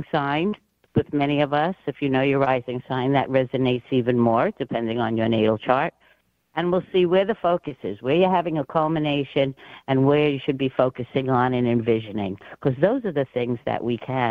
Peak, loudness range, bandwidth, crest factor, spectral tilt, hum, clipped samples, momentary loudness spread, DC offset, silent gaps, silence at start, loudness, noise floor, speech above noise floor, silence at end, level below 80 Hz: -2 dBFS; 1 LU; 5.2 kHz; 20 dB; -9 dB/octave; none; under 0.1%; 7 LU; under 0.1%; none; 0 s; -23 LUFS; -62 dBFS; 40 dB; 0 s; -56 dBFS